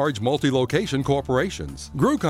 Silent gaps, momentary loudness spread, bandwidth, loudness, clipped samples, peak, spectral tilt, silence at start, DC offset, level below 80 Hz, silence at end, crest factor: none; 8 LU; 15.5 kHz; -23 LUFS; under 0.1%; -6 dBFS; -6 dB/octave; 0 s; under 0.1%; -44 dBFS; 0 s; 16 dB